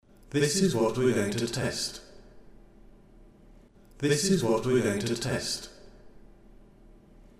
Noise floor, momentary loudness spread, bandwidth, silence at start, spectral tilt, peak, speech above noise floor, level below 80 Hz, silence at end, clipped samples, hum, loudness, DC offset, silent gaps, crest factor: -54 dBFS; 9 LU; 15.5 kHz; 0.3 s; -4.5 dB/octave; -12 dBFS; 28 dB; -54 dBFS; 1.2 s; under 0.1%; none; -27 LUFS; under 0.1%; none; 18 dB